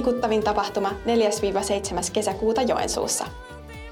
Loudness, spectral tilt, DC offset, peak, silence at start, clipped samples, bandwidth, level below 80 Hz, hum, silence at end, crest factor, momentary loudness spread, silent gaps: -24 LUFS; -3.5 dB/octave; under 0.1%; -10 dBFS; 0 s; under 0.1%; 18.5 kHz; -44 dBFS; none; 0 s; 14 dB; 9 LU; none